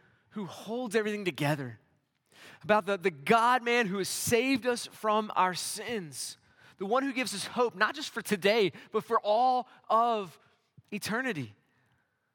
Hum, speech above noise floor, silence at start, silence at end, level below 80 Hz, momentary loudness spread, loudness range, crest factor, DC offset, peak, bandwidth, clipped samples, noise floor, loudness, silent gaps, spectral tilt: none; 44 dB; 0.35 s; 0.85 s; -76 dBFS; 14 LU; 4 LU; 22 dB; under 0.1%; -8 dBFS; 18 kHz; under 0.1%; -73 dBFS; -29 LUFS; none; -4 dB/octave